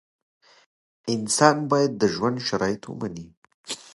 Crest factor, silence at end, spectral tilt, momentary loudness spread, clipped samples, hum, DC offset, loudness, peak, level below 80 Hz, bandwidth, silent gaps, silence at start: 24 dB; 0.15 s; -4 dB/octave; 17 LU; under 0.1%; none; under 0.1%; -23 LUFS; 0 dBFS; -60 dBFS; 11.5 kHz; 3.37-3.42 s, 3.54-3.64 s; 1.05 s